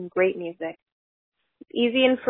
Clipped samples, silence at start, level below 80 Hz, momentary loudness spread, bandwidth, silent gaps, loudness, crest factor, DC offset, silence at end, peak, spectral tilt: under 0.1%; 0 s; -68 dBFS; 15 LU; 3.9 kHz; 0.82-0.86 s, 0.92-1.32 s; -24 LUFS; 20 dB; under 0.1%; 0 s; -6 dBFS; -8.5 dB/octave